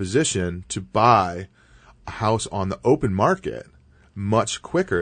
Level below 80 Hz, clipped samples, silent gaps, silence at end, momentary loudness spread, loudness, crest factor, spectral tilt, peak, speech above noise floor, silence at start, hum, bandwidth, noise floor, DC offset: -48 dBFS; under 0.1%; none; 0 s; 20 LU; -22 LUFS; 20 dB; -5 dB/octave; -2 dBFS; 30 dB; 0 s; none; 9.6 kHz; -51 dBFS; under 0.1%